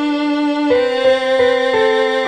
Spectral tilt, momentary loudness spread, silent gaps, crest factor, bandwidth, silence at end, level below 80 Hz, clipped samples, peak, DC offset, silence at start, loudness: -4 dB/octave; 3 LU; none; 12 dB; 9.2 kHz; 0 s; -52 dBFS; under 0.1%; -2 dBFS; under 0.1%; 0 s; -14 LUFS